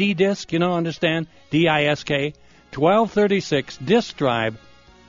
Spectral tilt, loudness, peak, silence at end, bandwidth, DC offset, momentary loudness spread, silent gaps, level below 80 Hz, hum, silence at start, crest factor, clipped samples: -4 dB/octave; -21 LUFS; -4 dBFS; 0.5 s; 7.4 kHz; under 0.1%; 6 LU; none; -54 dBFS; none; 0 s; 18 dB; under 0.1%